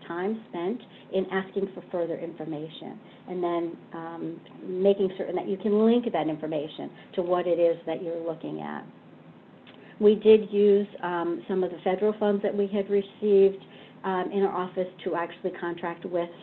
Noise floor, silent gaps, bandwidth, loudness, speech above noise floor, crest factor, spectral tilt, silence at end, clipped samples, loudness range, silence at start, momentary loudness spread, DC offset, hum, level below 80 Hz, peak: -50 dBFS; none; 4.2 kHz; -27 LUFS; 24 dB; 20 dB; -9.5 dB/octave; 0 s; under 0.1%; 8 LU; 0 s; 15 LU; under 0.1%; none; -72 dBFS; -6 dBFS